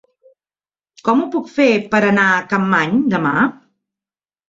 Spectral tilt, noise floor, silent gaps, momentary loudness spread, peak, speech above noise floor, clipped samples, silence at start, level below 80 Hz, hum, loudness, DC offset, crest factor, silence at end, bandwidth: -6.5 dB/octave; under -90 dBFS; none; 5 LU; -2 dBFS; over 75 dB; under 0.1%; 1.05 s; -58 dBFS; none; -16 LUFS; under 0.1%; 16 dB; 0.95 s; 7.8 kHz